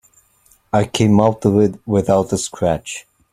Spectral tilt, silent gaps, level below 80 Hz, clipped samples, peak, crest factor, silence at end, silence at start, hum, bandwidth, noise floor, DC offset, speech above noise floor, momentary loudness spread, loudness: -6 dB/octave; none; -46 dBFS; under 0.1%; 0 dBFS; 16 dB; 0.3 s; 0.75 s; none; 14.5 kHz; -55 dBFS; under 0.1%; 40 dB; 9 LU; -17 LUFS